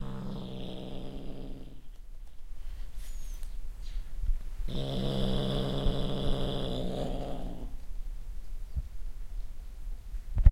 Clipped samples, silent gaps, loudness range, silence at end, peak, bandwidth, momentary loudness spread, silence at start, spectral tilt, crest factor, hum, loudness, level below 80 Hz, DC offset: under 0.1%; none; 12 LU; 0 s; -4 dBFS; 12.5 kHz; 16 LU; 0 s; -7 dB/octave; 26 dB; none; -37 LUFS; -34 dBFS; under 0.1%